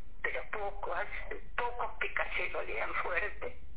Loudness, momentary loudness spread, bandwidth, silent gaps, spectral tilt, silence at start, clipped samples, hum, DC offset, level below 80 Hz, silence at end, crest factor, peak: -36 LUFS; 7 LU; 4 kHz; none; -1.5 dB/octave; 0 s; under 0.1%; none; 2%; -50 dBFS; 0 s; 20 dB; -16 dBFS